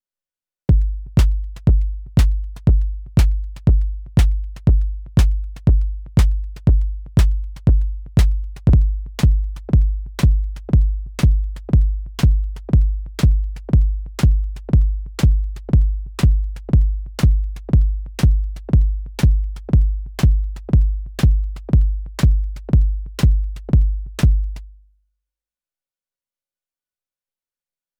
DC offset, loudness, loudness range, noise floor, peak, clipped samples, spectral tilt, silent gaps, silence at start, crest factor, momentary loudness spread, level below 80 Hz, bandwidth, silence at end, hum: under 0.1%; -19 LUFS; 1 LU; under -90 dBFS; -4 dBFS; under 0.1%; -7.5 dB/octave; none; 0.7 s; 12 dB; 5 LU; -18 dBFS; 10.5 kHz; 3.3 s; none